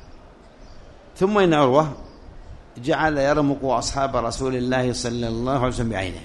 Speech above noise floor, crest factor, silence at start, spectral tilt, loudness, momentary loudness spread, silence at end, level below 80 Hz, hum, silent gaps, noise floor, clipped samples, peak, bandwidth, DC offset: 24 dB; 20 dB; 0.05 s; -5.5 dB/octave; -21 LUFS; 8 LU; 0 s; -40 dBFS; none; none; -45 dBFS; under 0.1%; -2 dBFS; 11.5 kHz; under 0.1%